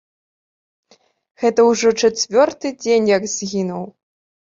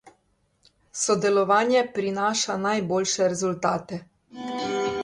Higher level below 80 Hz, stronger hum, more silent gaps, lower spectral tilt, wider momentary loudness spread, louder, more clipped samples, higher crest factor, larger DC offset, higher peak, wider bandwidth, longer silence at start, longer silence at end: about the same, -62 dBFS vs -64 dBFS; neither; neither; about the same, -3.5 dB/octave vs -3.5 dB/octave; second, 11 LU vs 14 LU; first, -17 LUFS vs -24 LUFS; neither; about the same, 18 dB vs 18 dB; neither; first, -2 dBFS vs -8 dBFS; second, 7.8 kHz vs 11.5 kHz; first, 1.4 s vs 0.05 s; first, 0.7 s vs 0 s